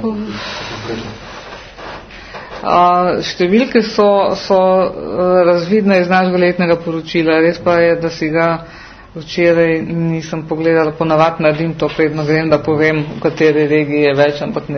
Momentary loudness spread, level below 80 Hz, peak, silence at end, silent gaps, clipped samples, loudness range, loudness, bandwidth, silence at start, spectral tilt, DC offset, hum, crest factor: 18 LU; -44 dBFS; 0 dBFS; 0 s; none; under 0.1%; 3 LU; -14 LUFS; 6.6 kHz; 0 s; -6.5 dB/octave; under 0.1%; none; 14 dB